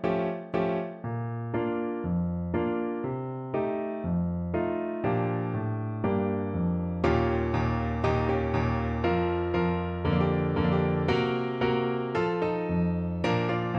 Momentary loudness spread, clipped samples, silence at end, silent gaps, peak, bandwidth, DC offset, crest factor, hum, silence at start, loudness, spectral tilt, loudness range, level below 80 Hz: 5 LU; under 0.1%; 0 s; none; -12 dBFS; 6.6 kHz; under 0.1%; 16 dB; none; 0 s; -28 LUFS; -8.5 dB/octave; 4 LU; -44 dBFS